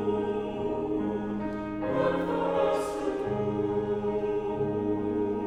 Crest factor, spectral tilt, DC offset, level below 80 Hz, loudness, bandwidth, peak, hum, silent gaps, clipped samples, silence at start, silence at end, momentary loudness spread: 14 dB; -7.5 dB/octave; under 0.1%; -52 dBFS; -29 LUFS; 12 kHz; -14 dBFS; none; none; under 0.1%; 0 s; 0 s; 5 LU